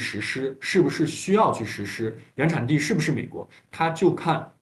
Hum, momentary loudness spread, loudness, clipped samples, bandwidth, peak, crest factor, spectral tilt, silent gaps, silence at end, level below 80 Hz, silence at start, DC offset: none; 10 LU; -24 LUFS; under 0.1%; 12.5 kHz; -6 dBFS; 18 dB; -5.5 dB/octave; none; 0.1 s; -62 dBFS; 0 s; under 0.1%